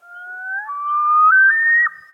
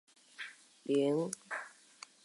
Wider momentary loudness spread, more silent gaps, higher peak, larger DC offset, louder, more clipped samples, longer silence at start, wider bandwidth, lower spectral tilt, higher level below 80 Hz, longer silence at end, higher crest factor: second, 17 LU vs 21 LU; neither; first, -6 dBFS vs -20 dBFS; neither; first, -13 LUFS vs -36 LUFS; neither; second, 0.1 s vs 0.4 s; second, 3.3 kHz vs 11.5 kHz; second, -0.5 dB/octave vs -5 dB/octave; first, -82 dBFS vs under -90 dBFS; second, 0.2 s vs 0.55 s; second, 10 dB vs 18 dB